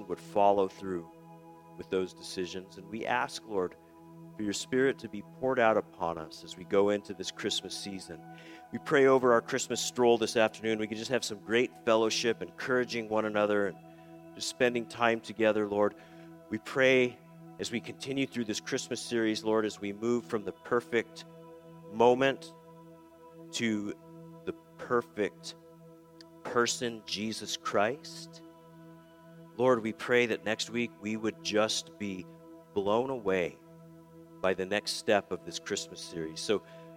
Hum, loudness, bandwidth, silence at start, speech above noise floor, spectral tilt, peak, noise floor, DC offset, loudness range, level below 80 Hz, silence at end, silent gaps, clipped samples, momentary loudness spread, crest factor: none; -31 LUFS; 16.5 kHz; 0 s; 23 dB; -4 dB/octave; -10 dBFS; -54 dBFS; under 0.1%; 6 LU; -72 dBFS; 0 s; none; under 0.1%; 18 LU; 22 dB